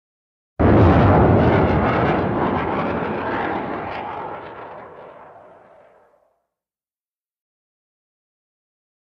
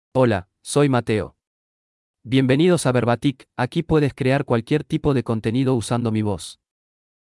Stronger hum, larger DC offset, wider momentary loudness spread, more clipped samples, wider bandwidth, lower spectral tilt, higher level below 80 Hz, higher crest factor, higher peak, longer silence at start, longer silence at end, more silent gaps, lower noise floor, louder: neither; neither; first, 22 LU vs 8 LU; neither; second, 6 kHz vs 12 kHz; first, -10 dB/octave vs -6.5 dB/octave; first, -34 dBFS vs -48 dBFS; about the same, 20 dB vs 16 dB; first, -2 dBFS vs -6 dBFS; first, 0.6 s vs 0.15 s; first, 3.85 s vs 0.85 s; second, none vs 1.47-2.14 s; about the same, under -90 dBFS vs under -90 dBFS; first, -18 LUFS vs -21 LUFS